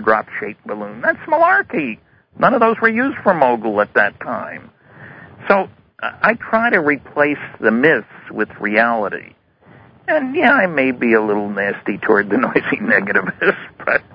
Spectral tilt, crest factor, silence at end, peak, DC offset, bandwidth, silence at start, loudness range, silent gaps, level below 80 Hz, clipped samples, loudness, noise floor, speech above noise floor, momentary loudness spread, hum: -9 dB/octave; 18 dB; 0.15 s; 0 dBFS; under 0.1%; 5.2 kHz; 0 s; 3 LU; none; -56 dBFS; under 0.1%; -16 LUFS; -46 dBFS; 30 dB; 13 LU; none